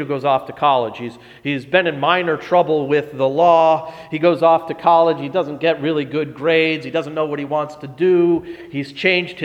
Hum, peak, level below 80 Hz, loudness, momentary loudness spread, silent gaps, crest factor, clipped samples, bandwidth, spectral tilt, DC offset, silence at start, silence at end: none; 0 dBFS; -60 dBFS; -17 LUFS; 11 LU; none; 16 dB; under 0.1%; 8.6 kHz; -7 dB/octave; under 0.1%; 0 s; 0 s